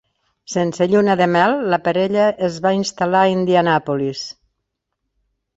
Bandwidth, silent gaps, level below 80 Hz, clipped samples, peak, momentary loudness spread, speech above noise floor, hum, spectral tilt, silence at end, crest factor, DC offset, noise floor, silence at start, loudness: 8 kHz; none; -60 dBFS; under 0.1%; -2 dBFS; 7 LU; 60 dB; none; -5.5 dB/octave; 1.25 s; 16 dB; under 0.1%; -76 dBFS; 0.5 s; -17 LUFS